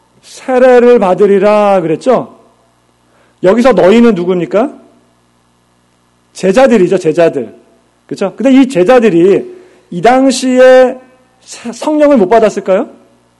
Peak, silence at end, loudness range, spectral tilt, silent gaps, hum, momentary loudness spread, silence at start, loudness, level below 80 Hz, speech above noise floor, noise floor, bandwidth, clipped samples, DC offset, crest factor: 0 dBFS; 0.5 s; 4 LU; -6 dB/octave; none; 60 Hz at -40 dBFS; 16 LU; 0.35 s; -8 LUFS; -46 dBFS; 45 dB; -52 dBFS; 12 kHz; 2%; under 0.1%; 10 dB